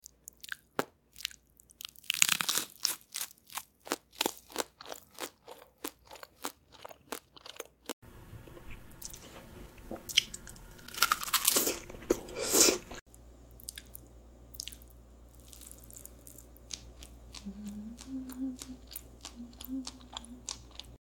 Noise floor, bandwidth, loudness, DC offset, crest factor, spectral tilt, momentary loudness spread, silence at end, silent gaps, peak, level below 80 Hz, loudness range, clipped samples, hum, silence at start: -59 dBFS; 17.5 kHz; -33 LUFS; under 0.1%; 36 dB; -1 dB/octave; 24 LU; 0.1 s; 7.93-8.02 s, 13.01-13.06 s; -2 dBFS; -58 dBFS; 18 LU; under 0.1%; none; 0.45 s